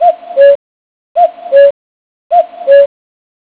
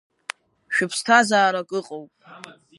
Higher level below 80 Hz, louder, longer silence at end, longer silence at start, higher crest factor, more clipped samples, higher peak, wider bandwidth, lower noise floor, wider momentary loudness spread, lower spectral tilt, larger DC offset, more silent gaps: first, -66 dBFS vs -76 dBFS; first, -9 LUFS vs -20 LUFS; first, 0.6 s vs 0.25 s; second, 0 s vs 0.7 s; second, 10 dB vs 20 dB; first, 2% vs under 0.1%; about the same, 0 dBFS vs -2 dBFS; second, 4 kHz vs 11.5 kHz; first, under -90 dBFS vs -39 dBFS; second, 6 LU vs 21 LU; first, -5 dB/octave vs -3 dB/octave; neither; first, 0.55-1.15 s, 1.71-2.30 s vs none